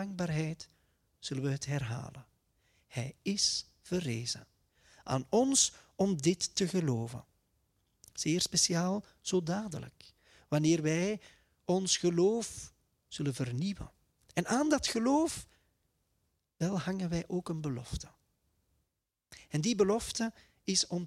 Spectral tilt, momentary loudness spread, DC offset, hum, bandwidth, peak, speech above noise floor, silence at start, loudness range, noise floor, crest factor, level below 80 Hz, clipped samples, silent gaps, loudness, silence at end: -4 dB/octave; 15 LU; under 0.1%; none; 15 kHz; -14 dBFS; 52 dB; 0 s; 7 LU; -85 dBFS; 20 dB; -60 dBFS; under 0.1%; none; -32 LUFS; 0 s